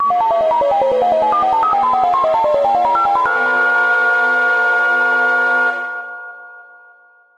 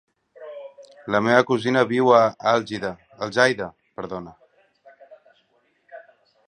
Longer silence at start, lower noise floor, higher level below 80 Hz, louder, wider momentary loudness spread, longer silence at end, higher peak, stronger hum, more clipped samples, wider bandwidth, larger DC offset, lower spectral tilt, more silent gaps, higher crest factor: second, 0 s vs 0.4 s; second, -48 dBFS vs -65 dBFS; first, -54 dBFS vs -64 dBFS; first, -14 LUFS vs -21 LUFS; second, 4 LU vs 23 LU; first, 0.75 s vs 0.5 s; about the same, -2 dBFS vs 0 dBFS; neither; neither; about the same, 10 kHz vs 9.8 kHz; neither; second, -3.5 dB/octave vs -5 dB/octave; neither; second, 12 dB vs 22 dB